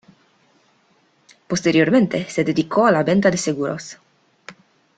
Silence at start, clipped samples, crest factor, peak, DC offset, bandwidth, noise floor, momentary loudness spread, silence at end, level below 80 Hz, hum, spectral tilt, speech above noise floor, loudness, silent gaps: 1.5 s; under 0.1%; 18 dB; -2 dBFS; under 0.1%; 9.4 kHz; -60 dBFS; 11 LU; 0.45 s; -60 dBFS; none; -5.5 dB/octave; 42 dB; -18 LUFS; none